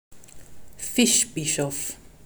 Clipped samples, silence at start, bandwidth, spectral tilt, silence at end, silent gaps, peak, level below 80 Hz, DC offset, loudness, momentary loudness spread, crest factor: under 0.1%; 0.1 s; over 20 kHz; -2.5 dB/octave; 0.15 s; none; -6 dBFS; -54 dBFS; under 0.1%; -23 LUFS; 13 LU; 20 dB